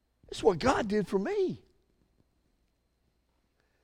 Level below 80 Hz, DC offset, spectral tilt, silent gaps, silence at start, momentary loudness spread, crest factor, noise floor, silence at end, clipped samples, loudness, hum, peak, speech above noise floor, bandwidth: -56 dBFS; under 0.1%; -5.5 dB/octave; none; 0.3 s; 12 LU; 22 dB; -74 dBFS; 2.25 s; under 0.1%; -29 LUFS; none; -12 dBFS; 46 dB; 12.5 kHz